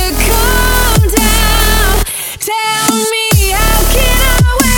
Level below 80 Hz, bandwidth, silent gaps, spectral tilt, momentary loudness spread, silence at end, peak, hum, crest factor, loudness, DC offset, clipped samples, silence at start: -14 dBFS; over 20 kHz; none; -3.5 dB/octave; 4 LU; 0 s; 0 dBFS; none; 10 dB; -10 LUFS; under 0.1%; under 0.1%; 0 s